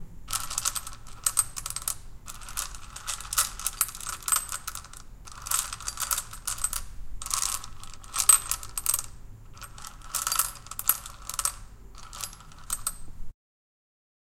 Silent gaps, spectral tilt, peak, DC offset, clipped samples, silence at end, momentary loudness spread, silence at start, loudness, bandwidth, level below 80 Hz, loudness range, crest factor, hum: none; 1 dB/octave; -4 dBFS; under 0.1%; under 0.1%; 1 s; 19 LU; 0 s; -28 LUFS; 17 kHz; -46 dBFS; 5 LU; 28 dB; none